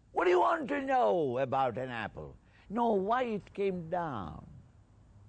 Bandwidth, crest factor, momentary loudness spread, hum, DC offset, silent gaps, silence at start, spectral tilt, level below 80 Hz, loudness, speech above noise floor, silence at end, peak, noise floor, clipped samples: 8.8 kHz; 16 dB; 14 LU; none; under 0.1%; none; 0.15 s; -7 dB/octave; -60 dBFS; -32 LUFS; 28 dB; 0.7 s; -18 dBFS; -59 dBFS; under 0.1%